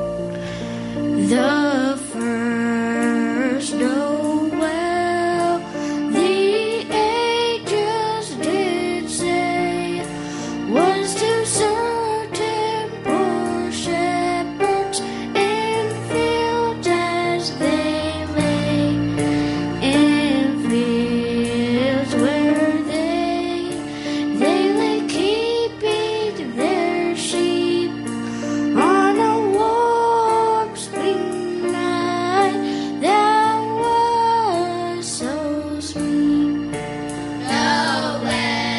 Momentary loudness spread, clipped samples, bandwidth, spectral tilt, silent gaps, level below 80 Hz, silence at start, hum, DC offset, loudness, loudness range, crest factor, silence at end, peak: 7 LU; under 0.1%; 11.5 kHz; -4.5 dB/octave; none; -50 dBFS; 0 s; none; under 0.1%; -20 LUFS; 3 LU; 16 dB; 0 s; -4 dBFS